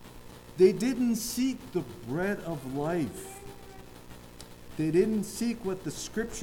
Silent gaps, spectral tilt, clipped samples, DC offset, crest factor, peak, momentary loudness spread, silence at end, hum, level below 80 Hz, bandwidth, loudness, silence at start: none; -5.5 dB/octave; under 0.1%; under 0.1%; 20 dB; -10 dBFS; 24 LU; 0 s; 60 Hz at -55 dBFS; -54 dBFS; 18.5 kHz; -30 LUFS; 0 s